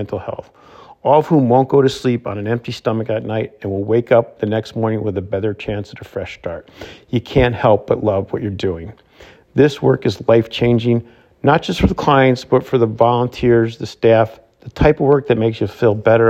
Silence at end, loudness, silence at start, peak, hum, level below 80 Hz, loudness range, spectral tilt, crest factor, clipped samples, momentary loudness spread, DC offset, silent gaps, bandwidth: 0 s; -16 LUFS; 0 s; 0 dBFS; none; -38 dBFS; 5 LU; -7.5 dB/octave; 16 dB; under 0.1%; 13 LU; under 0.1%; none; 13.5 kHz